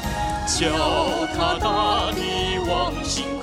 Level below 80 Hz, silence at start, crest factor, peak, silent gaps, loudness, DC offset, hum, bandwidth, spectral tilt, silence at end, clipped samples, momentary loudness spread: -34 dBFS; 0 s; 16 dB; -8 dBFS; none; -22 LUFS; under 0.1%; none; 16.5 kHz; -3.5 dB/octave; 0 s; under 0.1%; 5 LU